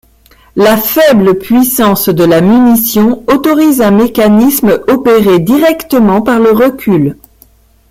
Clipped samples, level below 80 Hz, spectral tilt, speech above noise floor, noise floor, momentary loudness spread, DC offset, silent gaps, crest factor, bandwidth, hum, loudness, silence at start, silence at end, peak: under 0.1%; -38 dBFS; -5.5 dB/octave; 37 dB; -44 dBFS; 4 LU; under 0.1%; none; 8 dB; 16.5 kHz; none; -8 LUFS; 0.55 s; 0.8 s; 0 dBFS